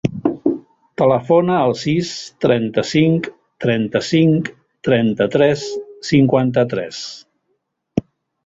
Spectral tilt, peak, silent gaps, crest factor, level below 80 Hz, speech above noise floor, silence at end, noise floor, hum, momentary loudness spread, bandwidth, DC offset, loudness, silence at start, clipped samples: -6.5 dB/octave; 0 dBFS; none; 16 dB; -52 dBFS; 54 dB; 0.45 s; -70 dBFS; none; 13 LU; 7.8 kHz; under 0.1%; -17 LUFS; 0.05 s; under 0.1%